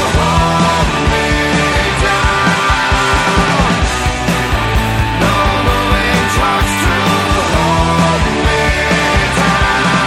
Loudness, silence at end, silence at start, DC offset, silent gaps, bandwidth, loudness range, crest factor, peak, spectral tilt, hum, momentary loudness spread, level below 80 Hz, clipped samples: -12 LUFS; 0 s; 0 s; under 0.1%; none; 16.5 kHz; 1 LU; 12 dB; 0 dBFS; -4.5 dB/octave; none; 3 LU; -20 dBFS; under 0.1%